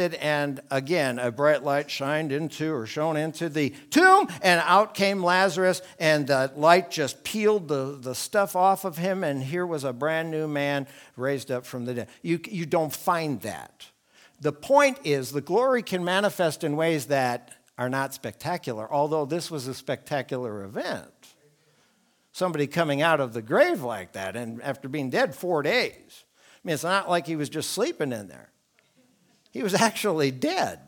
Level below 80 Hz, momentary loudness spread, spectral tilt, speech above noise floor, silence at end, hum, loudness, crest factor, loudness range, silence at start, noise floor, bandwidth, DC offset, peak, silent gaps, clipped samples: -72 dBFS; 12 LU; -4.5 dB/octave; 41 dB; 0.1 s; none; -25 LUFS; 22 dB; 8 LU; 0 s; -66 dBFS; 19.5 kHz; under 0.1%; -4 dBFS; none; under 0.1%